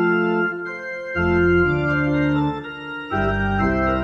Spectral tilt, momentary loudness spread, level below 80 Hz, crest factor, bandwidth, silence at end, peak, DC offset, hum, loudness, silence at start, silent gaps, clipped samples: -8.5 dB/octave; 11 LU; -36 dBFS; 14 dB; 6.6 kHz; 0 s; -8 dBFS; under 0.1%; none; -21 LUFS; 0 s; none; under 0.1%